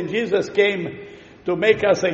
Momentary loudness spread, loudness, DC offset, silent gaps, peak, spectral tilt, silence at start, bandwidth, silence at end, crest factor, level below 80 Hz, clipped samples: 14 LU; -20 LUFS; under 0.1%; none; -2 dBFS; -3.5 dB/octave; 0 s; 7.8 kHz; 0 s; 18 dB; -56 dBFS; under 0.1%